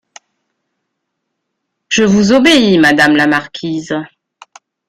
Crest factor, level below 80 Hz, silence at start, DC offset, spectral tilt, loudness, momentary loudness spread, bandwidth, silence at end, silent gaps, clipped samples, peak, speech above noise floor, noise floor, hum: 14 dB; -48 dBFS; 1.9 s; under 0.1%; -4.5 dB/octave; -10 LUFS; 13 LU; 15 kHz; 0.85 s; none; under 0.1%; 0 dBFS; 63 dB; -73 dBFS; none